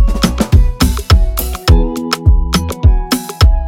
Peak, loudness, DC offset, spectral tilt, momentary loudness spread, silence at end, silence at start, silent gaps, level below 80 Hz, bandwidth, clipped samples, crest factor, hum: 0 dBFS; -13 LUFS; under 0.1%; -5.5 dB/octave; 5 LU; 0 s; 0 s; none; -12 dBFS; 17 kHz; under 0.1%; 10 dB; none